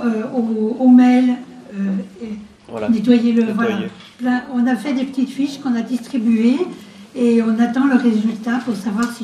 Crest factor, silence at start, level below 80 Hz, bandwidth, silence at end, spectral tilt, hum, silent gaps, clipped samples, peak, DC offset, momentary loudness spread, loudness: 16 dB; 0 s; -60 dBFS; 11 kHz; 0 s; -6.5 dB/octave; none; none; under 0.1%; 0 dBFS; under 0.1%; 13 LU; -17 LUFS